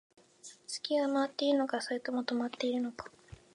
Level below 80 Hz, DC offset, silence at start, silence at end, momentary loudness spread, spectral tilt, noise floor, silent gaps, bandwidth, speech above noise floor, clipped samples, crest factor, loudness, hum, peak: -70 dBFS; under 0.1%; 0.45 s; 0.2 s; 19 LU; -3.5 dB/octave; -56 dBFS; none; 11 kHz; 24 dB; under 0.1%; 18 dB; -33 LUFS; none; -16 dBFS